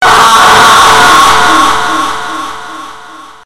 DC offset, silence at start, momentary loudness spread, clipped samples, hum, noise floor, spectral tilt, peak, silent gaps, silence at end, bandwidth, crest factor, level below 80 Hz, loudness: under 0.1%; 0 s; 18 LU; 5%; none; -30 dBFS; -1.5 dB/octave; 0 dBFS; none; 0 s; over 20 kHz; 6 dB; -34 dBFS; -4 LUFS